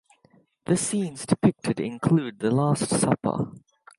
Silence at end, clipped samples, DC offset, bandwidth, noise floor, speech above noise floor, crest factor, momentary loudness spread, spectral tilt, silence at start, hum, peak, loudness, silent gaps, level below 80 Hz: 0.4 s; under 0.1%; under 0.1%; 11.5 kHz; -61 dBFS; 37 dB; 20 dB; 6 LU; -6 dB/octave; 0.7 s; none; -4 dBFS; -25 LUFS; none; -58 dBFS